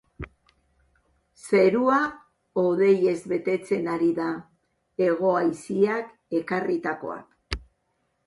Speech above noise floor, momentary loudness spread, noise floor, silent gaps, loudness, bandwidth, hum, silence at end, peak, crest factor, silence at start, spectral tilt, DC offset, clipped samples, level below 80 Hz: 50 dB; 16 LU; -73 dBFS; none; -24 LUFS; 11.5 kHz; none; 0.7 s; -8 dBFS; 18 dB; 0.2 s; -6.5 dB/octave; under 0.1%; under 0.1%; -52 dBFS